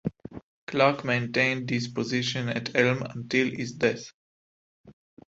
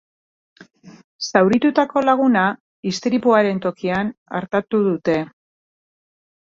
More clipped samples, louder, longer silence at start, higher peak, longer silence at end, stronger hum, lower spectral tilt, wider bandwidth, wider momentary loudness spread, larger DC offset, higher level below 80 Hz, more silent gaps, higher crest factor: neither; second, -26 LUFS vs -19 LUFS; second, 0.05 s vs 0.85 s; second, -6 dBFS vs -2 dBFS; second, 0.4 s vs 1.2 s; neither; about the same, -5 dB/octave vs -6 dB/octave; about the same, 8 kHz vs 7.6 kHz; first, 14 LU vs 10 LU; neither; about the same, -62 dBFS vs -60 dBFS; first, 0.43-0.67 s, 4.14-4.84 s vs 1.04-1.19 s, 2.60-2.83 s, 4.17-4.26 s; about the same, 22 dB vs 18 dB